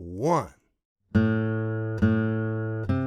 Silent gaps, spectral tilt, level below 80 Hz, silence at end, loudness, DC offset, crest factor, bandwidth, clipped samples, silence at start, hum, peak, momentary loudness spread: 0.85-0.96 s; -8.5 dB/octave; -50 dBFS; 0 s; -26 LUFS; under 0.1%; 18 dB; 9 kHz; under 0.1%; 0 s; none; -8 dBFS; 6 LU